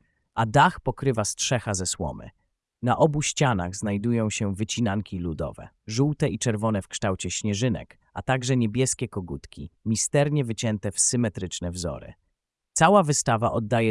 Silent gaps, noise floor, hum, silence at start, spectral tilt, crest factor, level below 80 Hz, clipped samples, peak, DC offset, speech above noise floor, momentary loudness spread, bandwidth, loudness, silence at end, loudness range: none; -78 dBFS; none; 0.35 s; -4.5 dB/octave; 20 dB; -50 dBFS; under 0.1%; -6 dBFS; under 0.1%; 53 dB; 13 LU; 12 kHz; -25 LUFS; 0 s; 3 LU